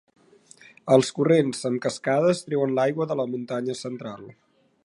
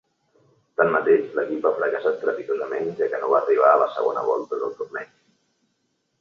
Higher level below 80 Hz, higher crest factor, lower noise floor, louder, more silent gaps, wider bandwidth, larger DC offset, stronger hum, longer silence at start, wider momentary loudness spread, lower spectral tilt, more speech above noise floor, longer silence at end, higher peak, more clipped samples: about the same, -72 dBFS vs -74 dBFS; about the same, 20 dB vs 20 dB; second, -53 dBFS vs -72 dBFS; about the same, -24 LUFS vs -22 LUFS; neither; first, 11.5 kHz vs 6.8 kHz; neither; neither; about the same, 0.85 s vs 0.8 s; about the same, 14 LU vs 13 LU; second, -5.5 dB/octave vs -7 dB/octave; second, 30 dB vs 51 dB; second, 0.55 s vs 1.15 s; about the same, -4 dBFS vs -4 dBFS; neither